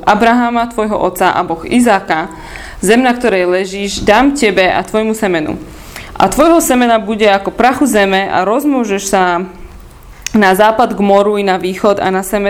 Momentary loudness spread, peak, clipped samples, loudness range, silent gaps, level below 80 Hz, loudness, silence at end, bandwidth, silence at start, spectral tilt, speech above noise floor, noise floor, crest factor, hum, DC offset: 9 LU; 0 dBFS; 0.4%; 2 LU; none; -36 dBFS; -11 LUFS; 0 s; 18 kHz; 0 s; -4.5 dB/octave; 23 dB; -34 dBFS; 12 dB; none; under 0.1%